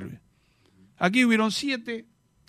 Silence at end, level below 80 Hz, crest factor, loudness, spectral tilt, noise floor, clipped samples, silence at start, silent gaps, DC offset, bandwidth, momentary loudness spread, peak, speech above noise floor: 0.45 s; -68 dBFS; 20 dB; -24 LUFS; -4.5 dB/octave; -64 dBFS; under 0.1%; 0 s; none; under 0.1%; 15 kHz; 17 LU; -8 dBFS; 40 dB